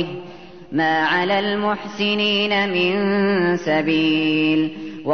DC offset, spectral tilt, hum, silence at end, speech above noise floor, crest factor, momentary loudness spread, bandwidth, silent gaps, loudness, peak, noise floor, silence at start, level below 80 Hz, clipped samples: 0.5%; -6 dB/octave; none; 0 s; 20 dB; 12 dB; 9 LU; 6.6 kHz; none; -19 LUFS; -8 dBFS; -39 dBFS; 0 s; -60 dBFS; under 0.1%